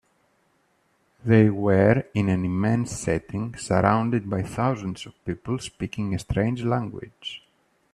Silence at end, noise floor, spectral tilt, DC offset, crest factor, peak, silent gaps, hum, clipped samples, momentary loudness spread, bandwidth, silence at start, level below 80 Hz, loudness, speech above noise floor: 0.55 s; -67 dBFS; -7 dB/octave; under 0.1%; 22 dB; -4 dBFS; none; none; under 0.1%; 16 LU; 12 kHz; 1.25 s; -48 dBFS; -24 LUFS; 43 dB